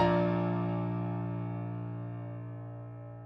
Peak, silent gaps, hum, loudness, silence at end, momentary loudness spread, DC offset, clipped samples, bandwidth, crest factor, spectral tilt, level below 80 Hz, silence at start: -16 dBFS; none; none; -35 LUFS; 0 s; 14 LU; under 0.1%; under 0.1%; 5.8 kHz; 18 dB; -10 dB/octave; -58 dBFS; 0 s